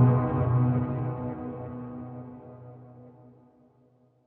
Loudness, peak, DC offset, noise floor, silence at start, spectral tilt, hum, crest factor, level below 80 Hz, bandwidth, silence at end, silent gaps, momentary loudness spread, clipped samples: -28 LUFS; -10 dBFS; under 0.1%; -63 dBFS; 0 s; -11.5 dB/octave; none; 18 dB; -54 dBFS; 3 kHz; 1.15 s; none; 24 LU; under 0.1%